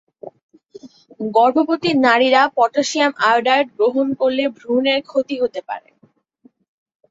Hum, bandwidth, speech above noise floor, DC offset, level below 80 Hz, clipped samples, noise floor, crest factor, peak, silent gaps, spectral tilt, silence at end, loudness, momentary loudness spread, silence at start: none; 8 kHz; 41 dB; under 0.1%; -66 dBFS; under 0.1%; -57 dBFS; 16 dB; -2 dBFS; 0.43-0.49 s; -3.5 dB/octave; 1.3 s; -17 LUFS; 9 LU; 0.25 s